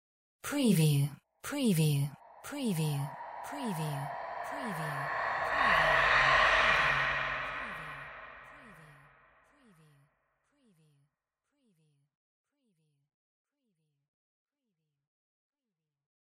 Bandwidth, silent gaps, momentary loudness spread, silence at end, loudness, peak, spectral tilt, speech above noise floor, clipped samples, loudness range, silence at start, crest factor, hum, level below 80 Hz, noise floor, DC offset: 16 kHz; none; 19 LU; 7.45 s; -30 LUFS; -14 dBFS; -5 dB/octave; over 60 dB; under 0.1%; 12 LU; 0.45 s; 20 dB; none; -58 dBFS; under -90 dBFS; under 0.1%